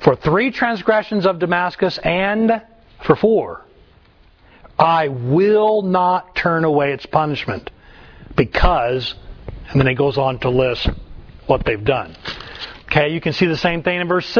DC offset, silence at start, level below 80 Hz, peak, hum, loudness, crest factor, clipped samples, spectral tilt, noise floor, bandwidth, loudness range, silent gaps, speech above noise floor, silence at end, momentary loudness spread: under 0.1%; 0 s; -34 dBFS; 0 dBFS; none; -17 LUFS; 18 dB; under 0.1%; -7.5 dB/octave; -50 dBFS; 5.4 kHz; 3 LU; none; 33 dB; 0 s; 14 LU